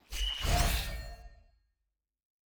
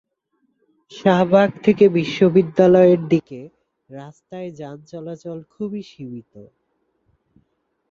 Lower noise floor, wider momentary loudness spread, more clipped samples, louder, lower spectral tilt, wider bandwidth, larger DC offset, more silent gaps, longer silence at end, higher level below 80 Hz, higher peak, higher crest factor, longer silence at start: first, -86 dBFS vs -70 dBFS; second, 19 LU vs 24 LU; neither; second, -33 LUFS vs -16 LUFS; second, -3 dB/octave vs -8 dB/octave; first, over 20 kHz vs 7.2 kHz; neither; neither; second, 1.15 s vs 1.5 s; first, -38 dBFS vs -60 dBFS; second, -16 dBFS vs -2 dBFS; about the same, 20 dB vs 18 dB; second, 0.1 s vs 0.95 s